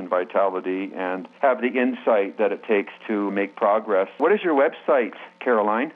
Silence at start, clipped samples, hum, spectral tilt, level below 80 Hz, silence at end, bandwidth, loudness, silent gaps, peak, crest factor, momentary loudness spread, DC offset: 0 s; under 0.1%; none; -8 dB/octave; -90 dBFS; 0.05 s; 4.7 kHz; -22 LUFS; none; -8 dBFS; 14 dB; 8 LU; under 0.1%